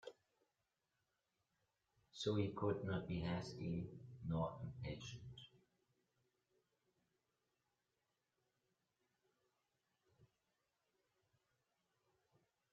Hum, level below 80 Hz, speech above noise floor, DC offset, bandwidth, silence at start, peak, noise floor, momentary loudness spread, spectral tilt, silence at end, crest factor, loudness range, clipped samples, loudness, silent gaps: none; -72 dBFS; 45 dB; under 0.1%; 7.6 kHz; 0.05 s; -28 dBFS; -89 dBFS; 18 LU; -6 dB/octave; 2.5 s; 24 dB; 13 LU; under 0.1%; -45 LUFS; none